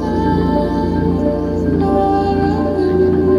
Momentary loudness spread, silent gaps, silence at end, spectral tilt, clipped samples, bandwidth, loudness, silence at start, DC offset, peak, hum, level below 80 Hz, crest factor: 3 LU; none; 0 s; -9 dB/octave; under 0.1%; 10.5 kHz; -16 LUFS; 0 s; under 0.1%; -2 dBFS; none; -30 dBFS; 12 dB